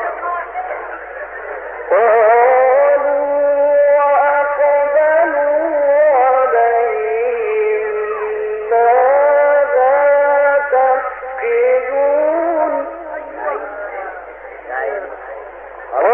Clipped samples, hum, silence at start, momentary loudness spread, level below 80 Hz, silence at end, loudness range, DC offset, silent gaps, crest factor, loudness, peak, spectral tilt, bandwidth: under 0.1%; none; 0 s; 16 LU; -52 dBFS; 0 s; 7 LU; under 0.1%; none; 12 dB; -14 LUFS; -2 dBFS; -8 dB/octave; 3.2 kHz